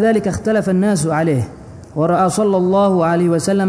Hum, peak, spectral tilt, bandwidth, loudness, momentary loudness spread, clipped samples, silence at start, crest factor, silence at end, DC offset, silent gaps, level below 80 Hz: none; -4 dBFS; -6.5 dB/octave; 11 kHz; -16 LUFS; 6 LU; under 0.1%; 0 s; 12 dB; 0 s; under 0.1%; none; -46 dBFS